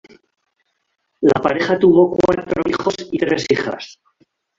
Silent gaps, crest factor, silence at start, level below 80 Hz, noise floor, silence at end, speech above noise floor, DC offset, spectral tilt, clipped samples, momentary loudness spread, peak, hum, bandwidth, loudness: none; 16 dB; 1.2 s; -50 dBFS; -69 dBFS; 0.65 s; 53 dB; under 0.1%; -6 dB/octave; under 0.1%; 9 LU; -2 dBFS; none; 7.6 kHz; -17 LUFS